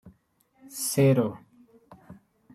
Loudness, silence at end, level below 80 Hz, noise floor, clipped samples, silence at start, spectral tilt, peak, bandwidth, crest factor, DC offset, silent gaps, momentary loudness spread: -25 LUFS; 0.4 s; -68 dBFS; -67 dBFS; under 0.1%; 0.05 s; -6 dB/octave; -10 dBFS; 15.5 kHz; 18 dB; under 0.1%; none; 21 LU